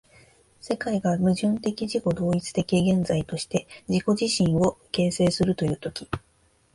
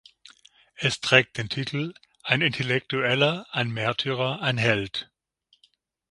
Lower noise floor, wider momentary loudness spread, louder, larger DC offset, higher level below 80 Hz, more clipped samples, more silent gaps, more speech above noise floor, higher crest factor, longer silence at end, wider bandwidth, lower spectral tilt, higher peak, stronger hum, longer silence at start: second, -63 dBFS vs -67 dBFS; about the same, 9 LU vs 11 LU; about the same, -25 LUFS vs -24 LUFS; neither; first, -50 dBFS vs -60 dBFS; neither; neither; about the same, 39 dB vs 42 dB; second, 16 dB vs 26 dB; second, 0.55 s vs 1.1 s; about the same, 11.5 kHz vs 11.5 kHz; first, -6 dB/octave vs -4.5 dB/octave; second, -10 dBFS vs 0 dBFS; neither; second, 0.65 s vs 0.8 s